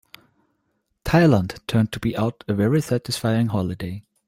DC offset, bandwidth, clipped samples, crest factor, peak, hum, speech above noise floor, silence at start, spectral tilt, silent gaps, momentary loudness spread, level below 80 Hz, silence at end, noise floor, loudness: under 0.1%; 16.5 kHz; under 0.1%; 18 dB; -4 dBFS; none; 51 dB; 1.05 s; -6.5 dB/octave; none; 11 LU; -46 dBFS; 0.25 s; -72 dBFS; -22 LUFS